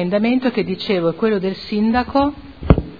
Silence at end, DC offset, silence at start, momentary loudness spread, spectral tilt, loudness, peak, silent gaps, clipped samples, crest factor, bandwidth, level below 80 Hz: 0 s; 0.4%; 0 s; 5 LU; -9 dB/octave; -19 LUFS; 0 dBFS; none; under 0.1%; 18 dB; 5 kHz; -30 dBFS